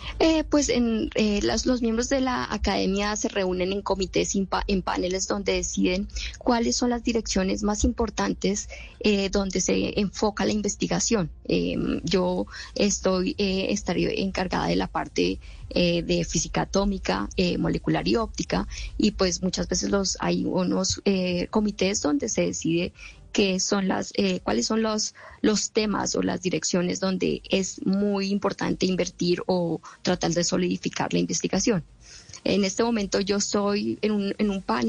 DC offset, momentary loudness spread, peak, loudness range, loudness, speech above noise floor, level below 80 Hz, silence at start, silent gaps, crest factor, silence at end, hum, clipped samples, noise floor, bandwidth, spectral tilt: under 0.1%; 4 LU; -10 dBFS; 1 LU; -25 LUFS; 21 dB; -42 dBFS; 0 s; none; 14 dB; 0 s; none; under 0.1%; -46 dBFS; 9.6 kHz; -4.5 dB/octave